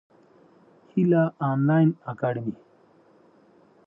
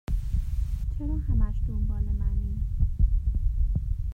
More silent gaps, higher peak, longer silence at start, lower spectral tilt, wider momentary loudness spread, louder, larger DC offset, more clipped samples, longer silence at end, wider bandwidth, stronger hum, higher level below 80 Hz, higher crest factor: neither; about the same, -10 dBFS vs -12 dBFS; first, 0.95 s vs 0.1 s; first, -11.5 dB/octave vs -9.5 dB/octave; first, 12 LU vs 5 LU; first, -24 LUFS vs -30 LUFS; neither; neither; first, 1.35 s vs 0 s; first, 3.7 kHz vs 2.6 kHz; neither; second, -72 dBFS vs -26 dBFS; about the same, 16 dB vs 14 dB